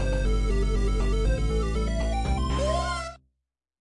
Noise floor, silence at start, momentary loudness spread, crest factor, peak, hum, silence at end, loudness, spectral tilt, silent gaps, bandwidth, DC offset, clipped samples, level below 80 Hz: -81 dBFS; 0 s; 2 LU; 12 dB; -14 dBFS; none; 0.8 s; -27 LUFS; -6 dB/octave; none; 11 kHz; under 0.1%; under 0.1%; -26 dBFS